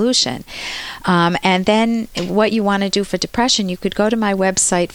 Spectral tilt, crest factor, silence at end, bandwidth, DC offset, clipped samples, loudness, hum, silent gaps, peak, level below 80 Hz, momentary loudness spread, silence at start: -3.5 dB/octave; 16 dB; 0 s; 18.5 kHz; under 0.1%; under 0.1%; -17 LUFS; none; none; -2 dBFS; -44 dBFS; 8 LU; 0 s